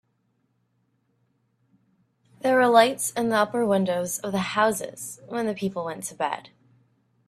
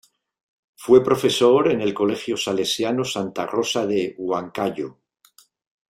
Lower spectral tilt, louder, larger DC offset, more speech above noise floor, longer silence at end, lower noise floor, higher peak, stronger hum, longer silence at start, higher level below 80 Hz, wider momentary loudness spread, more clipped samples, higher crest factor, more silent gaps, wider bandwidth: about the same, -4 dB/octave vs -4.5 dB/octave; second, -24 LUFS vs -21 LUFS; neither; first, 47 dB vs 36 dB; second, 0.8 s vs 1 s; first, -71 dBFS vs -57 dBFS; about the same, -2 dBFS vs -2 dBFS; neither; first, 2.45 s vs 0.8 s; second, -68 dBFS vs -62 dBFS; first, 14 LU vs 10 LU; neither; about the same, 24 dB vs 20 dB; neither; about the same, 15.5 kHz vs 15.5 kHz